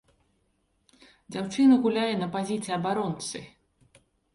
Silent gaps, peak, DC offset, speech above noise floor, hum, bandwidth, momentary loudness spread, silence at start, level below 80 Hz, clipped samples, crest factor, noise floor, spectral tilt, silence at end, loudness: none; -10 dBFS; under 0.1%; 46 dB; none; 11.5 kHz; 15 LU; 1.3 s; -66 dBFS; under 0.1%; 18 dB; -72 dBFS; -5.5 dB/octave; 0.85 s; -26 LUFS